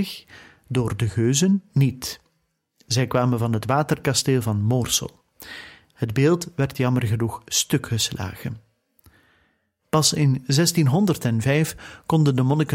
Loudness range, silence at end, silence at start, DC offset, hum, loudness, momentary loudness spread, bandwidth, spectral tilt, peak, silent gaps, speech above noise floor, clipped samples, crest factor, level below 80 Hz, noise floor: 3 LU; 0 s; 0 s; under 0.1%; none; -22 LUFS; 14 LU; 16.5 kHz; -5 dB/octave; -4 dBFS; none; 50 dB; under 0.1%; 18 dB; -52 dBFS; -71 dBFS